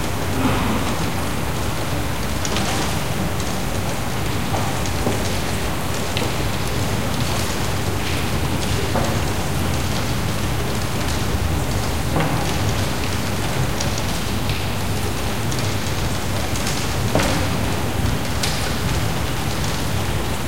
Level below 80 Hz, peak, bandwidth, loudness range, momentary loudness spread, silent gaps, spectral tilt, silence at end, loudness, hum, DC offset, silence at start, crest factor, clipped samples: -30 dBFS; -4 dBFS; 17 kHz; 1 LU; 3 LU; none; -4.5 dB/octave; 0 s; -22 LUFS; none; 5%; 0 s; 18 dB; under 0.1%